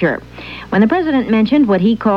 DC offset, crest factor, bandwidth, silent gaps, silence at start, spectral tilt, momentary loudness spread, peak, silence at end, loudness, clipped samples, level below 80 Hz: 0.2%; 12 dB; 5.8 kHz; none; 0 s; -8.5 dB/octave; 14 LU; -2 dBFS; 0 s; -14 LUFS; under 0.1%; -42 dBFS